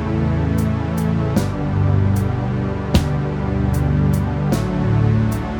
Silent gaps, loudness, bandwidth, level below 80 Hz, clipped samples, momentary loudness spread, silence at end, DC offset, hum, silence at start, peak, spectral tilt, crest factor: none; -19 LUFS; over 20 kHz; -28 dBFS; under 0.1%; 4 LU; 0 s; under 0.1%; none; 0 s; -2 dBFS; -7.5 dB/octave; 16 dB